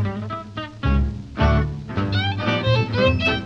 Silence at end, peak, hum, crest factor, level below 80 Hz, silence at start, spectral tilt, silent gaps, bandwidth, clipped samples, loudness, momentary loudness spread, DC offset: 0 s; -6 dBFS; none; 14 dB; -28 dBFS; 0 s; -7 dB/octave; none; 7.4 kHz; under 0.1%; -22 LUFS; 11 LU; under 0.1%